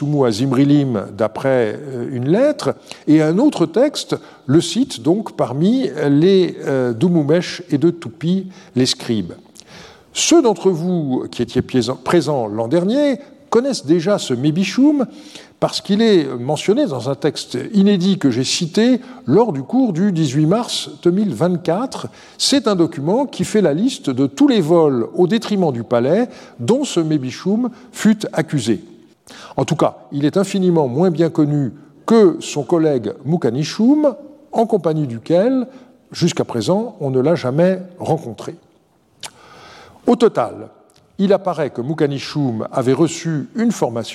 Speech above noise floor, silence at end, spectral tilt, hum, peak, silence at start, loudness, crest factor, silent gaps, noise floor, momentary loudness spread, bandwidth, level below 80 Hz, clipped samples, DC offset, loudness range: 39 dB; 0 s; -6 dB/octave; none; -2 dBFS; 0 s; -17 LUFS; 14 dB; none; -56 dBFS; 9 LU; 13.5 kHz; -60 dBFS; under 0.1%; under 0.1%; 3 LU